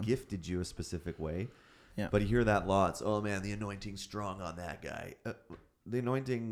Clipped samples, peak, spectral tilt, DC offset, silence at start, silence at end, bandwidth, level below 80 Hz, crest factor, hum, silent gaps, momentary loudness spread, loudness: under 0.1%; -14 dBFS; -6 dB/octave; under 0.1%; 0 s; 0 s; 15 kHz; -52 dBFS; 22 dB; none; none; 15 LU; -36 LUFS